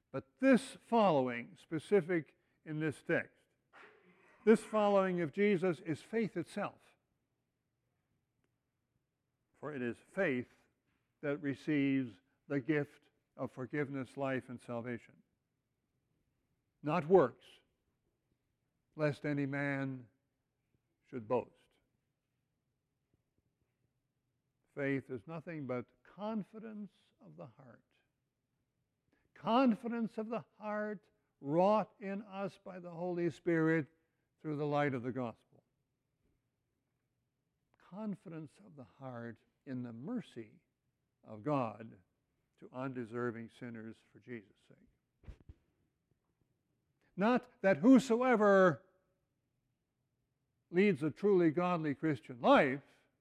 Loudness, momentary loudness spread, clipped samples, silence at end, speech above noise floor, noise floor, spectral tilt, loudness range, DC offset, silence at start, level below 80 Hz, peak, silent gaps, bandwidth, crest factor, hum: -35 LUFS; 20 LU; under 0.1%; 0.4 s; 51 dB; -86 dBFS; -7 dB/octave; 15 LU; under 0.1%; 0.15 s; -76 dBFS; -14 dBFS; none; 11.5 kHz; 24 dB; none